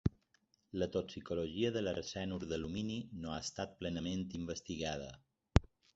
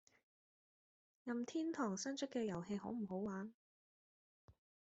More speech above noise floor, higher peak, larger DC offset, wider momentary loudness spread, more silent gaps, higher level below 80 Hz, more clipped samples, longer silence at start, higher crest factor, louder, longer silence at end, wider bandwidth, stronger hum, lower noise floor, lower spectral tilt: second, 36 dB vs over 46 dB; first, -8 dBFS vs -28 dBFS; neither; about the same, 8 LU vs 7 LU; second, none vs 3.54-4.48 s; first, -48 dBFS vs -82 dBFS; neither; second, 0.05 s vs 1.25 s; first, 30 dB vs 18 dB; first, -40 LUFS vs -44 LUFS; about the same, 0.3 s vs 0.4 s; about the same, 8 kHz vs 8 kHz; neither; second, -76 dBFS vs under -90 dBFS; about the same, -5.5 dB/octave vs -5.5 dB/octave